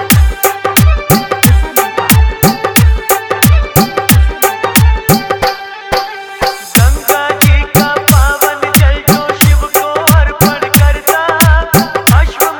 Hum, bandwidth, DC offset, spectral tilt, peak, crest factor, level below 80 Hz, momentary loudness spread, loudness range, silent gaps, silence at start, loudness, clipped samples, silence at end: none; over 20 kHz; under 0.1%; -4.5 dB/octave; 0 dBFS; 10 dB; -14 dBFS; 5 LU; 2 LU; none; 0 s; -9 LUFS; 1%; 0 s